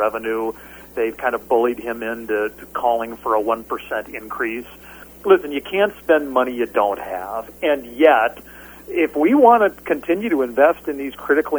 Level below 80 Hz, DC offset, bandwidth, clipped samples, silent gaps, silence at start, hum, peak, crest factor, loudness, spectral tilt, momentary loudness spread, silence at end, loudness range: -52 dBFS; under 0.1%; over 20 kHz; under 0.1%; none; 0 s; none; 0 dBFS; 20 dB; -19 LUFS; -5 dB/octave; 14 LU; 0 s; 5 LU